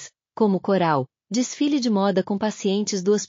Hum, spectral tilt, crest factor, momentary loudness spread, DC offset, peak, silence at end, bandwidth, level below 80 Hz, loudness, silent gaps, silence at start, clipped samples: none; -5.5 dB/octave; 14 dB; 5 LU; under 0.1%; -8 dBFS; 0.05 s; 7.4 kHz; -72 dBFS; -22 LUFS; none; 0 s; under 0.1%